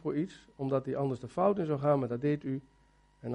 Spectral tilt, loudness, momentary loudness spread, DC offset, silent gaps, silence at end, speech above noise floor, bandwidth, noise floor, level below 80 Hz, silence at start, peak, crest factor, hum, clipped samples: -9 dB/octave; -32 LUFS; 11 LU; under 0.1%; none; 0 s; 22 dB; 10 kHz; -54 dBFS; -66 dBFS; 0.05 s; -14 dBFS; 18 dB; none; under 0.1%